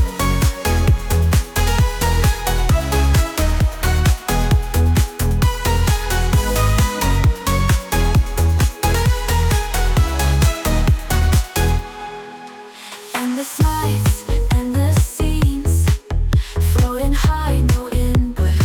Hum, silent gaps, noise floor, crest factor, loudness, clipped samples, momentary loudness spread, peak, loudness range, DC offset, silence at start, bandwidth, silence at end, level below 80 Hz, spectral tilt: none; none; -36 dBFS; 10 dB; -18 LUFS; under 0.1%; 4 LU; -6 dBFS; 3 LU; under 0.1%; 0 s; 19.5 kHz; 0 s; -20 dBFS; -5 dB/octave